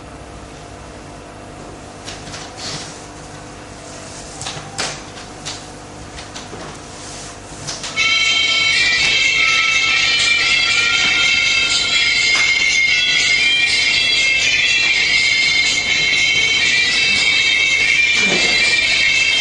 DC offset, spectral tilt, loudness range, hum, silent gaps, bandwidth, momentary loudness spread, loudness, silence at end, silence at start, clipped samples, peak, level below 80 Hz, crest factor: under 0.1%; 0 dB/octave; 18 LU; 50 Hz at -45 dBFS; none; 11.5 kHz; 20 LU; -12 LUFS; 0 s; 0 s; under 0.1%; 0 dBFS; -44 dBFS; 16 dB